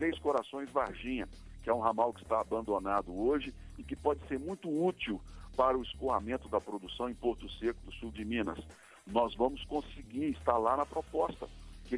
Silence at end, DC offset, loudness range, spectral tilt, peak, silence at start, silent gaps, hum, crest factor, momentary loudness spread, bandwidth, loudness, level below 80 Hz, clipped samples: 0 s; under 0.1%; 3 LU; -6 dB/octave; -12 dBFS; 0 s; none; none; 22 dB; 13 LU; 11 kHz; -35 LUFS; -52 dBFS; under 0.1%